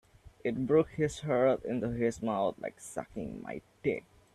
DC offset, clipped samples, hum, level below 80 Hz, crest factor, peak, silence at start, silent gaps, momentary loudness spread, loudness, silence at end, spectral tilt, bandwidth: under 0.1%; under 0.1%; none; -58 dBFS; 18 dB; -16 dBFS; 0.45 s; none; 13 LU; -33 LUFS; 0.35 s; -6.5 dB/octave; 13 kHz